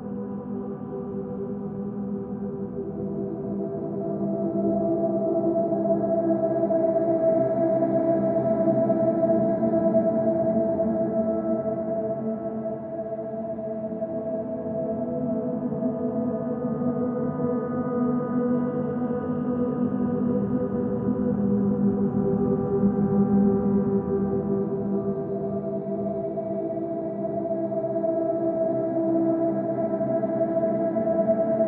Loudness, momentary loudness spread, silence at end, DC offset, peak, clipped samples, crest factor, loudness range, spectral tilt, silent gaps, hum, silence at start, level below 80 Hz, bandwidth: -25 LUFS; 9 LU; 0 s; under 0.1%; -10 dBFS; under 0.1%; 14 dB; 7 LU; -12 dB/octave; none; none; 0 s; -54 dBFS; 2.6 kHz